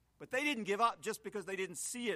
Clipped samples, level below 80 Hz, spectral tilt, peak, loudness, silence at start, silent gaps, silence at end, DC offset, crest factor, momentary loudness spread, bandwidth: under 0.1%; -76 dBFS; -2.5 dB/octave; -18 dBFS; -37 LUFS; 0.2 s; none; 0 s; under 0.1%; 20 dB; 9 LU; 15.5 kHz